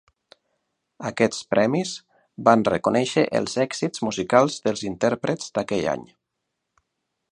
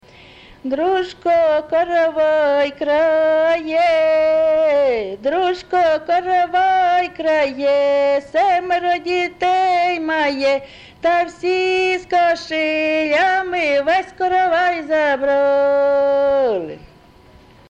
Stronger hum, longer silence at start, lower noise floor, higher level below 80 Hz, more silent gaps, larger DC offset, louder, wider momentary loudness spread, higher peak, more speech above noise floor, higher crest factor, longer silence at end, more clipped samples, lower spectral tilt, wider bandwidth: neither; first, 1 s vs 0.65 s; first, -80 dBFS vs -46 dBFS; second, -60 dBFS vs -52 dBFS; neither; neither; second, -23 LUFS vs -17 LUFS; first, 9 LU vs 4 LU; first, -2 dBFS vs -8 dBFS; first, 58 dB vs 30 dB; first, 22 dB vs 10 dB; first, 1.3 s vs 0.95 s; neither; about the same, -5 dB/octave vs -4 dB/octave; first, 11 kHz vs 8.8 kHz